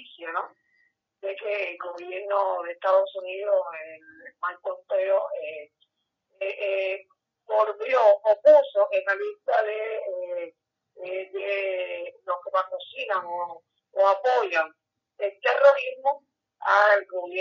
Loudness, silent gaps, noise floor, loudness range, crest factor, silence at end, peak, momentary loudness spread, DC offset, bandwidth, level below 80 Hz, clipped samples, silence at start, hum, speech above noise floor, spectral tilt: -25 LUFS; none; -77 dBFS; 8 LU; 20 dB; 0 s; -6 dBFS; 16 LU; under 0.1%; 6.8 kHz; under -90 dBFS; under 0.1%; 0 s; none; 53 dB; -2.5 dB/octave